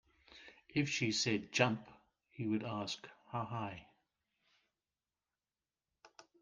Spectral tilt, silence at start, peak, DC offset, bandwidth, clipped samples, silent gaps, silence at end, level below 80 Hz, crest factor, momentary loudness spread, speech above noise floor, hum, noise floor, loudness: -4 dB/octave; 0.3 s; -14 dBFS; under 0.1%; 10 kHz; under 0.1%; none; 0.2 s; -76 dBFS; 26 dB; 18 LU; over 53 dB; none; under -90 dBFS; -38 LUFS